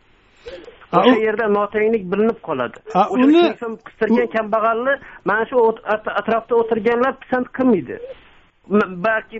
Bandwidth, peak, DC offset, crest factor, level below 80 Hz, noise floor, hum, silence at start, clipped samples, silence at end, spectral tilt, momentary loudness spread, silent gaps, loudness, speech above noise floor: 7.8 kHz; 0 dBFS; under 0.1%; 18 dB; -54 dBFS; -42 dBFS; none; 0.45 s; under 0.1%; 0 s; -4 dB/octave; 13 LU; none; -18 LUFS; 24 dB